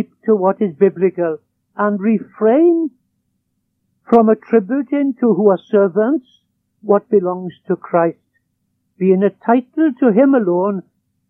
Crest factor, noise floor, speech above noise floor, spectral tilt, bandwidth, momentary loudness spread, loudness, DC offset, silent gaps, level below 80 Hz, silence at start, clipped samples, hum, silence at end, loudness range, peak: 16 dB; -69 dBFS; 55 dB; -11 dB/octave; 3.8 kHz; 10 LU; -15 LUFS; under 0.1%; none; -70 dBFS; 0 s; under 0.1%; none; 0.5 s; 3 LU; 0 dBFS